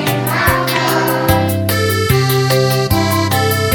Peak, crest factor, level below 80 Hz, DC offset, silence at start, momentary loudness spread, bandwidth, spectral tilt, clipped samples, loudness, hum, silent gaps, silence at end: 0 dBFS; 14 dB; -34 dBFS; under 0.1%; 0 s; 2 LU; 17.5 kHz; -5 dB/octave; under 0.1%; -14 LUFS; none; none; 0 s